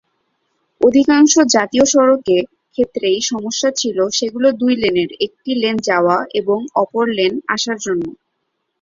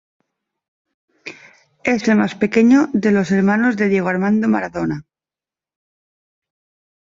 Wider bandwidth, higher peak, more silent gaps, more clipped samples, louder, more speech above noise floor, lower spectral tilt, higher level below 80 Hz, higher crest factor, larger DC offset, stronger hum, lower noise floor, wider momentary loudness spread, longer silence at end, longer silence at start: about the same, 7.6 kHz vs 7.6 kHz; about the same, 0 dBFS vs -2 dBFS; neither; neither; about the same, -15 LUFS vs -16 LUFS; second, 56 dB vs over 75 dB; second, -3 dB/octave vs -7 dB/octave; about the same, -56 dBFS vs -56 dBFS; about the same, 16 dB vs 16 dB; neither; neither; second, -71 dBFS vs under -90 dBFS; second, 9 LU vs 18 LU; second, 0.7 s vs 2 s; second, 0.8 s vs 1.25 s